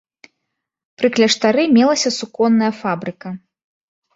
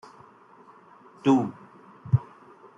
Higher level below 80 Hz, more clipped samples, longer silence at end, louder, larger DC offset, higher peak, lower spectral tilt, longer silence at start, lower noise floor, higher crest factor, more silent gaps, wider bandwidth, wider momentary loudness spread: about the same, -64 dBFS vs -60 dBFS; neither; first, 0.8 s vs 0.55 s; first, -16 LUFS vs -26 LUFS; neither; first, -2 dBFS vs -8 dBFS; second, -4 dB/octave vs -8.5 dB/octave; second, 1 s vs 1.25 s; first, -77 dBFS vs -53 dBFS; about the same, 16 dB vs 20 dB; neither; about the same, 8 kHz vs 7.8 kHz; second, 16 LU vs 26 LU